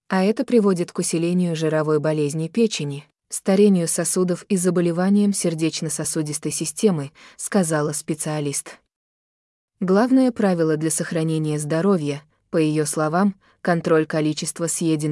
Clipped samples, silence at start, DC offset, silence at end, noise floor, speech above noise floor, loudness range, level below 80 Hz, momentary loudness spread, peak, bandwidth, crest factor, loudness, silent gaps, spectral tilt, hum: under 0.1%; 0.1 s; under 0.1%; 0 s; under -90 dBFS; over 70 dB; 3 LU; -66 dBFS; 8 LU; -6 dBFS; 12 kHz; 16 dB; -21 LUFS; 8.96-9.68 s; -5.5 dB/octave; none